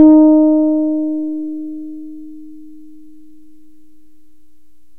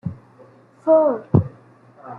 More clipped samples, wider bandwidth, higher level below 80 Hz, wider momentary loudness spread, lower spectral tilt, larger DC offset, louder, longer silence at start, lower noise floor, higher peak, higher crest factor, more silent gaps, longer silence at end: neither; second, 1.6 kHz vs 2.8 kHz; about the same, -54 dBFS vs -52 dBFS; first, 26 LU vs 17 LU; second, -10.5 dB/octave vs -12.5 dB/octave; first, 2% vs under 0.1%; first, -14 LUFS vs -18 LUFS; about the same, 0 s vs 0.05 s; first, -57 dBFS vs -49 dBFS; about the same, 0 dBFS vs -2 dBFS; about the same, 16 dB vs 18 dB; neither; first, 2.45 s vs 0 s